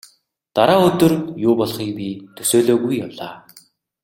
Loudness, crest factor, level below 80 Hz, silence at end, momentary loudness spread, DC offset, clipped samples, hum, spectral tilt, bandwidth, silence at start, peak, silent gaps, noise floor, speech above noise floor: -17 LUFS; 18 dB; -54 dBFS; 0.65 s; 16 LU; under 0.1%; under 0.1%; none; -5 dB/octave; 16.5 kHz; 0.55 s; 0 dBFS; none; -57 dBFS; 40 dB